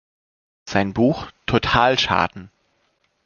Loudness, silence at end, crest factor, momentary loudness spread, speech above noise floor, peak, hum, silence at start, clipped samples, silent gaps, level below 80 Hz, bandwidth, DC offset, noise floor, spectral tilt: -19 LUFS; 0.8 s; 20 dB; 8 LU; 47 dB; -2 dBFS; none; 0.65 s; under 0.1%; none; -44 dBFS; 7.2 kHz; under 0.1%; -67 dBFS; -5 dB/octave